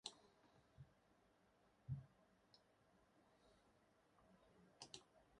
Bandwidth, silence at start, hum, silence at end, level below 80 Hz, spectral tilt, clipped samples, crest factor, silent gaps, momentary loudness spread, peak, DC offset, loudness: 11 kHz; 0.05 s; none; 0 s; -78 dBFS; -4.5 dB/octave; under 0.1%; 32 dB; none; 14 LU; -30 dBFS; under 0.1%; -58 LUFS